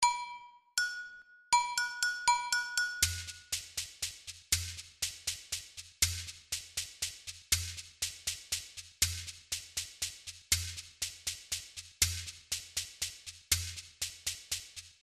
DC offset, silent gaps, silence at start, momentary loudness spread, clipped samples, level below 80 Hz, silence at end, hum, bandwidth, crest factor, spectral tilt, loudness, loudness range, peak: under 0.1%; none; 0 s; 11 LU; under 0.1%; -54 dBFS; 0.1 s; none; 14 kHz; 24 dB; 1 dB/octave; -34 LUFS; 3 LU; -12 dBFS